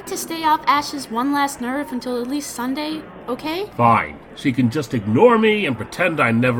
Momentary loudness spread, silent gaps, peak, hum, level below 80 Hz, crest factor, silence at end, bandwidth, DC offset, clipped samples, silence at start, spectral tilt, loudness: 11 LU; none; -2 dBFS; none; -52 dBFS; 18 dB; 0 s; 19.5 kHz; under 0.1%; under 0.1%; 0 s; -5 dB/octave; -19 LUFS